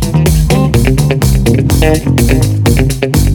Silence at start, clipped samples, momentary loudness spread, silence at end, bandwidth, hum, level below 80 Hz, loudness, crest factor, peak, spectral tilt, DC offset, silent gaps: 0 s; under 0.1%; 1 LU; 0 s; 19.5 kHz; none; -16 dBFS; -10 LUFS; 8 dB; 0 dBFS; -6 dB/octave; under 0.1%; none